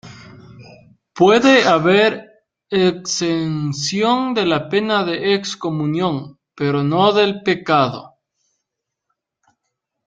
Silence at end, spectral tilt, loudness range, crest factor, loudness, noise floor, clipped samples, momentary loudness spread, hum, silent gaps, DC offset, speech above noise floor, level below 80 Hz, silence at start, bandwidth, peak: 2 s; -5 dB/octave; 4 LU; 18 dB; -17 LUFS; -79 dBFS; under 0.1%; 10 LU; none; none; under 0.1%; 63 dB; -58 dBFS; 0.05 s; 9.2 kHz; -2 dBFS